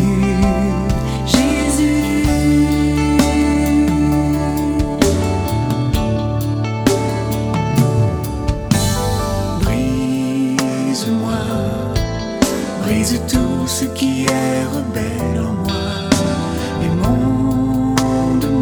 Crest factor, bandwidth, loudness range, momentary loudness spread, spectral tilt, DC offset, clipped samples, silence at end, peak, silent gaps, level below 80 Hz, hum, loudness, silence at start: 16 dB; over 20 kHz; 3 LU; 5 LU; -5.5 dB/octave; 0.1%; under 0.1%; 0 s; 0 dBFS; none; -26 dBFS; none; -17 LUFS; 0 s